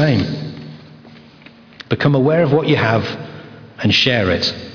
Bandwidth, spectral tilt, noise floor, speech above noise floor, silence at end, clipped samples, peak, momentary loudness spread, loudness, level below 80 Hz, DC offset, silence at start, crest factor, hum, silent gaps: 5.4 kHz; -6 dB/octave; -43 dBFS; 28 dB; 0 s; under 0.1%; -2 dBFS; 19 LU; -16 LUFS; -48 dBFS; under 0.1%; 0 s; 16 dB; none; none